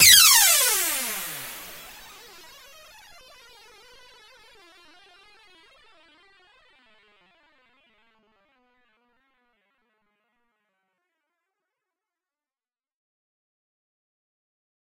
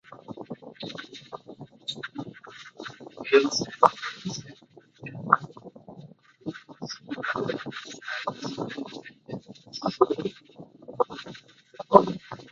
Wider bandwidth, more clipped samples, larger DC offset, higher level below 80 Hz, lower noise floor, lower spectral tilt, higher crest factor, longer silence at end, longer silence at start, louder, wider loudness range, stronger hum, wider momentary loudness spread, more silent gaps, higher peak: first, 16 kHz vs 7.8 kHz; neither; neither; first, -62 dBFS vs -68 dBFS; first, under -90 dBFS vs -55 dBFS; second, 2.5 dB/octave vs -4.5 dB/octave; about the same, 28 dB vs 30 dB; first, 13.15 s vs 0 s; about the same, 0 s vs 0.1 s; first, -16 LUFS vs -27 LUFS; first, 31 LU vs 8 LU; neither; first, 31 LU vs 23 LU; neither; about the same, 0 dBFS vs 0 dBFS